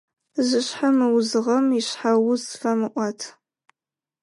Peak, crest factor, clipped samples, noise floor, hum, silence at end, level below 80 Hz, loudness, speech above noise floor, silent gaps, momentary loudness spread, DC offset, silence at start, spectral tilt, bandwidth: -10 dBFS; 14 dB; under 0.1%; under -90 dBFS; none; 0.9 s; -78 dBFS; -22 LUFS; over 69 dB; none; 9 LU; under 0.1%; 0.35 s; -4 dB/octave; 11.5 kHz